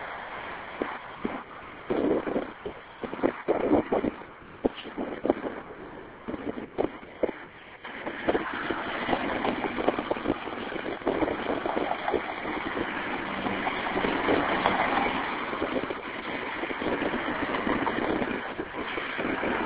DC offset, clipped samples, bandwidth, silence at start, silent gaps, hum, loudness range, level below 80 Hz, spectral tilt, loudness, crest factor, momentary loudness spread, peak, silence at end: under 0.1%; under 0.1%; 4 kHz; 0 s; none; none; 6 LU; -54 dBFS; -3 dB/octave; -30 LUFS; 24 dB; 13 LU; -6 dBFS; 0 s